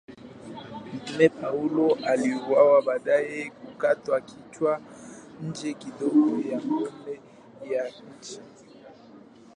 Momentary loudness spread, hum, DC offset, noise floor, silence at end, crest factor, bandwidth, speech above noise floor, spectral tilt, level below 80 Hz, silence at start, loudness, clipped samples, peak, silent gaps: 21 LU; none; under 0.1%; -50 dBFS; 0.35 s; 22 dB; 10.5 kHz; 25 dB; -6 dB/octave; -70 dBFS; 0.1 s; -25 LUFS; under 0.1%; -4 dBFS; none